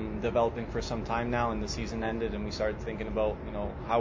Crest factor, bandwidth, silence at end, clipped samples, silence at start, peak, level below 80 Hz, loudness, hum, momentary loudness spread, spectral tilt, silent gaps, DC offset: 16 dB; 7.6 kHz; 0 s; under 0.1%; 0 s; -14 dBFS; -42 dBFS; -32 LUFS; none; 6 LU; -6 dB/octave; none; under 0.1%